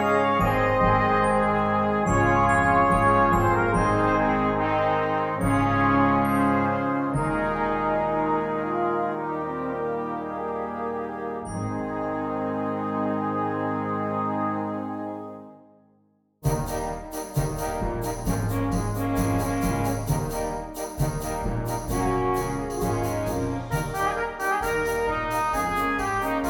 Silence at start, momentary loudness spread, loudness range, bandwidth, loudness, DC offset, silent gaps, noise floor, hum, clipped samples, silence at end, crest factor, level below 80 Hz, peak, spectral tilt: 0 s; 10 LU; 9 LU; 19 kHz; -25 LUFS; under 0.1%; none; -64 dBFS; none; under 0.1%; 0 s; 16 dB; -40 dBFS; -8 dBFS; -6.5 dB/octave